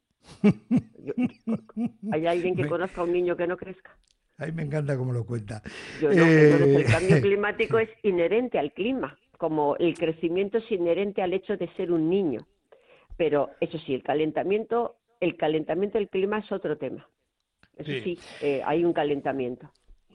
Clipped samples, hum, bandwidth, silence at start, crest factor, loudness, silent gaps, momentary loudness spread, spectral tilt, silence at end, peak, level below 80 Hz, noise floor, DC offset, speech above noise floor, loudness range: under 0.1%; none; 11 kHz; 0.3 s; 18 dB; -26 LUFS; none; 13 LU; -7.5 dB/octave; 0.5 s; -8 dBFS; -56 dBFS; -78 dBFS; under 0.1%; 53 dB; 8 LU